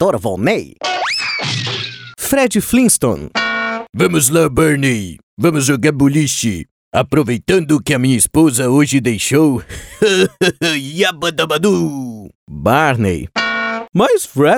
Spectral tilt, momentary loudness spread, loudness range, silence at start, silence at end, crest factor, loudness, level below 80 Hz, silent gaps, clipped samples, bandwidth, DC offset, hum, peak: -4.5 dB/octave; 9 LU; 2 LU; 0 s; 0 s; 14 dB; -14 LUFS; -42 dBFS; 3.89-3.93 s, 5.23-5.37 s, 6.71-6.92 s, 12.35-12.47 s; under 0.1%; over 20 kHz; under 0.1%; none; 0 dBFS